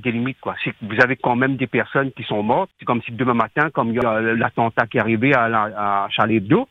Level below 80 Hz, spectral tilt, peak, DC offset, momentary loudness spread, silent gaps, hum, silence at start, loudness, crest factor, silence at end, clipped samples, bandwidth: -56 dBFS; -8 dB/octave; 0 dBFS; under 0.1%; 7 LU; none; none; 0 s; -19 LUFS; 20 dB; 0.05 s; under 0.1%; 6.8 kHz